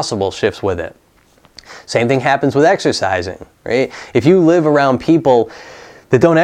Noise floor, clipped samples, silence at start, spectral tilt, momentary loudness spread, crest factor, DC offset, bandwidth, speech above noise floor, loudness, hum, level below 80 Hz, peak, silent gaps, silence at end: -51 dBFS; under 0.1%; 0 s; -6 dB/octave; 13 LU; 14 dB; under 0.1%; 10.5 kHz; 37 dB; -14 LUFS; none; -50 dBFS; 0 dBFS; none; 0 s